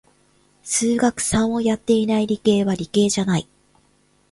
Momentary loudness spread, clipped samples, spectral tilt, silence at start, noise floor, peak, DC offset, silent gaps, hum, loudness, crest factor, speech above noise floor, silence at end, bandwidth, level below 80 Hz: 4 LU; under 0.1%; -4.5 dB/octave; 0.65 s; -60 dBFS; -4 dBFS; under 0.1%; none; none; -20 LUFS; 16 dB; 41 dB; 0.9 s; 11.5 kHz; -50 dBFS